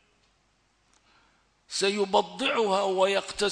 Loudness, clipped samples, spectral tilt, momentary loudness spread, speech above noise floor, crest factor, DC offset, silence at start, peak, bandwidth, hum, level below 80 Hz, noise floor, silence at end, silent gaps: -26 LUFS; under 0.1%; -3 dB/octave; 3 LU; 43 dB; 20 dB; under 0.1%; 1.7 s; -8 dBFS; 10.5 kHz; none; -64 dBFS; -68 dBFS; 0 s; none